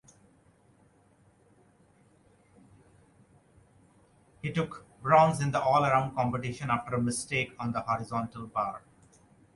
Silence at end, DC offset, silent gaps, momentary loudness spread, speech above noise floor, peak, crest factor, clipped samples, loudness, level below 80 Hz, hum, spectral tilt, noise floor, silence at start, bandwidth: 0.75 s; under 0.1%; none; 12 LU; 35 dB; -10 dBFS; 22 dB; under 0.1%; -29 LUFS; -62 dBFS; none; -5.5 dB/octave; -63 dBFS; 4.45 s; 11.5 kHz